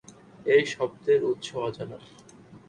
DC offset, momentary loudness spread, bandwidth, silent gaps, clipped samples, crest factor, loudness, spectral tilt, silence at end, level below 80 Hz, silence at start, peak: under 0.1%; 17 LU; 9.8 kHz; none; under 0.1%; 18 dB; -26 LUFS; -5 dB/octave; 0.1 s; -66 dBFS; 0.4 s; -10 dBFS